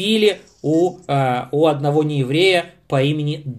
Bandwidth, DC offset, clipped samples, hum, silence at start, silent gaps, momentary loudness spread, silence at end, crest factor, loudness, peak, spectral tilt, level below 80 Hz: 13.5 kHz; under 0.1%; under 0.1%; none; 0 s; none; 5 LU; 0 s; 14 dB; -18 LUFS; -4 dBFS; -6 dB/octave; -58 dBFS